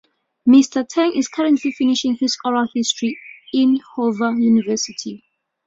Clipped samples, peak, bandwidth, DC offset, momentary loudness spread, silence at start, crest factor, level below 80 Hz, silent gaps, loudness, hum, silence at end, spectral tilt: under 0.1%; -2 dBFS; 7.8 kHz; under 0.1%; 10 LU; 0.45 s; 16 dB; -64 dBFS; none; -18 LUFS; none; 0.5 s; -3.5 dB/octave